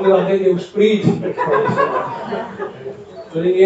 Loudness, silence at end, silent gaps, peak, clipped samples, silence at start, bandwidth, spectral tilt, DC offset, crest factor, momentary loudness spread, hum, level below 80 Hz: -17 LUFS; 0 s; none; 0 dBFS; under 0.1%; 0 s; 8 kHz; -7.5 dB/octave; under 0.1%; 16 dB; 14 LU; none; -58 dBFS